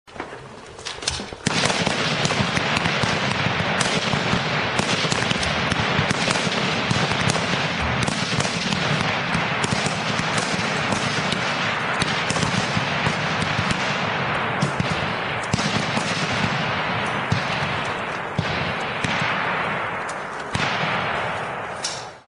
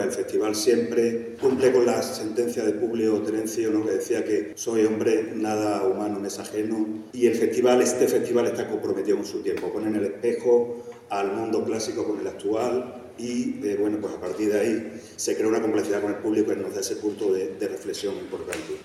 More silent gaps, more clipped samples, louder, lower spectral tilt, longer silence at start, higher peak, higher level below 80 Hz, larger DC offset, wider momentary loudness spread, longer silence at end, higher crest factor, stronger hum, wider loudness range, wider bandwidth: neither; neither; first, -22 LUFS vs -25 LUFS; about the same, -3.5 dB/octave vs -4.5 dB/octave; about the same, 0.05 s vs 0 s; first, -2 dBFS vs -8 dBFS; first, -46 dBFS vs -70 dBFS; neither; second, 6 LU vs 9 LU; about the same, 0.1 s vs 0 s; about the same, 22 dB vs 18 dB; neither; about the same, 3 LU vs 4 LU; second, 11 kHz vs 14.5 kHz